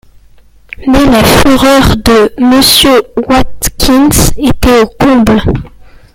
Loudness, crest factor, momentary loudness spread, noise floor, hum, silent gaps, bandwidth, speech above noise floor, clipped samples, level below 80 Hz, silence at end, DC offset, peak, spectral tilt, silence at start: -6 LUFS; 6 dB; 6 LU; -39 dBFS; none; none; over 20 kHz; 33 dB; 0.7%; -20 dBFS; 0.45 s; under 0.1%; 0 dBFS; -4 dB/octave; 0.8 s